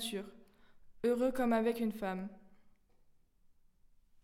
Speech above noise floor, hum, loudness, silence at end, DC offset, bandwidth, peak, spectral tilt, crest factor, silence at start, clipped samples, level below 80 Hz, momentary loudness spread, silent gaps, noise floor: 32 dB; none; -35 LUFS; 1.55 s; under 0.1%; 16.5 kHz; -20 dBFS; -5 dB/octave; 18 dB; 0 s; under 0.1%; -64 dBFS; 14 LU; none; -67 dBFS